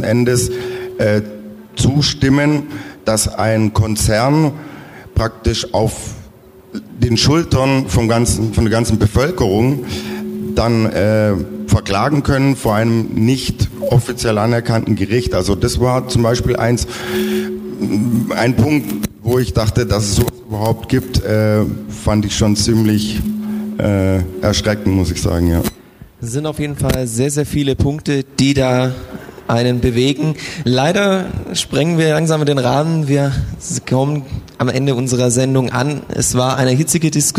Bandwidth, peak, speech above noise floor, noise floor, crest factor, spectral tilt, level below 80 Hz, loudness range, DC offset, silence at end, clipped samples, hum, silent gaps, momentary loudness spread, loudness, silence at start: 16 kHz; -2 dBFS; 26 dB; -41 dBFS; 12 dB; -5.5 dB/octave; -32 dBFS; 2 LU; under 0.1%; 0 s; under 0.1%; none; none; 8 LU; -16 LUFS; 0 s